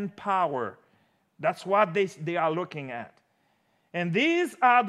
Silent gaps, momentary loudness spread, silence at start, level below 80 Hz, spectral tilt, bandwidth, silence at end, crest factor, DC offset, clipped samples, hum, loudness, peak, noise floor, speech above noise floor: none; 14 LU; 0 s; -84 dBFS; -5.5 dB/octave; 14 kHz; 0 s; 20 dB; under 0.1%; under 0.1%; none; -27 LUFS; -8 dBFS; -70 dBFS; 44 dB